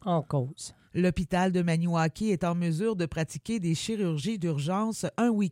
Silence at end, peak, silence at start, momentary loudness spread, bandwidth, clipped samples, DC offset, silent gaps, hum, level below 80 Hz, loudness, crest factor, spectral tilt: 0 s; -14 dBFS; 0.05 s; 5 LU; 14 kHz; under 0.1%; under 0.1%; none; none; -52 dBFS; -29 LUFS; 14 dB; -6.5 dB/octave